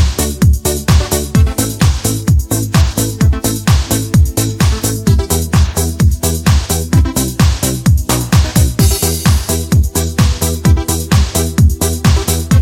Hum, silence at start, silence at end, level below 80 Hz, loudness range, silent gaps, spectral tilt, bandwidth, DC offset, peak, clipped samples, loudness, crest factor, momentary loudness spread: none; 0 s; 0 s; -16 dBFS; 1 LU; none; -5 dB/octave; 17 kHz; under 0.1%; 0 dBFS; under 0.1%; -13 LUFS; 12 dB; 2 LU